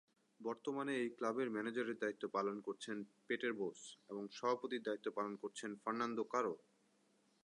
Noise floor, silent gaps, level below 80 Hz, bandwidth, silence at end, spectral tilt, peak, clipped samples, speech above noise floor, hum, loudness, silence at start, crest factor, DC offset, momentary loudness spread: -76 dBFS; none; under -90 dBFS; 11 kHz; 0.9 s; -4.5 dB/octave; -24 dBFS; under 0.1%; 34 dB; none; -43 LUFS; 0.4 s; 18 dB; under 0.1%; 8 LU